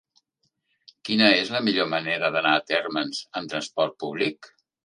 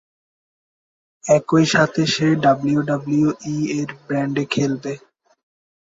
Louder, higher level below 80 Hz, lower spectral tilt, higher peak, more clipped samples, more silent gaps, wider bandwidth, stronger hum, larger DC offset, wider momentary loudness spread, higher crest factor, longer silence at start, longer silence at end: second, -23 LUFS vs -19 LUFS; second, -72 dBFS vs -58 dBFS; second, -4 dB/octave vs -5.5 dB/octave; about the same, -2 dBFS vs -2 dBFS; neither; neither; first, 11 kHz vs 7.8 kHz; neither; neither; about the same, 12 LU vs 10 LU; first, 24 dB vs 18 dB; second, 1.05 s vs 1.25 s; second, 0.4 s vs 1 s